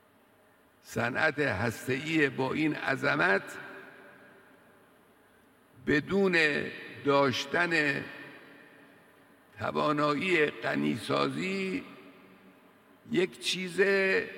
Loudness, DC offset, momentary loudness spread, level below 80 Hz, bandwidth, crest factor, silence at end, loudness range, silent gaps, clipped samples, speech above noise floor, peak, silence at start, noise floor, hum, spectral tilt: -29 LUFS; under 0.1%; 13 LU; -68 dBFS; 17 kHz; 20 dB; 0 s; 4 LU; none; under 0.1%; 34 dB; -12 dBFS; 0.85 s; -63 dBFS; none; -5 dB/octave